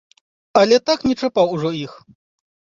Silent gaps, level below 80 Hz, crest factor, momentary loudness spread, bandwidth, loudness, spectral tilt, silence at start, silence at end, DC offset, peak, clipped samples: none; -54 dBFS; 18 dB; 12 LU; 7.6 kHz; -18 LUFS; -5 dB/octave; 0.55 s; 0.85 s; under 0.1%; -2 dBFS; under 0.1%